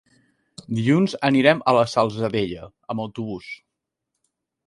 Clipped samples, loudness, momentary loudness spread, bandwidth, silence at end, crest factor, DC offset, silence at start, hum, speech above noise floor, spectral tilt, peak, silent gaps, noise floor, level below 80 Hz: under 0.1%; -21 LUFS; 17 LU; 11.5 kHz; 1.1 s; 20 dB; under 0.1%; 0.7 s; none; 61 dB; -6.5 dB/octave; -2 dBFS; none; -82 dBFS; -58 dBFS